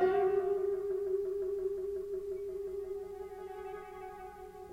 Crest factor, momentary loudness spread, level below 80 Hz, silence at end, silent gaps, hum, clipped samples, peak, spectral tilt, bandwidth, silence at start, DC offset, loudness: 16 dB; 15 LU; -62 dBFS; 0 s; none; none; under 0.1%; -18 dBFS; -7 dB/octave; 10.5 kHz; 0 s; under 0.1%; -37 LUFS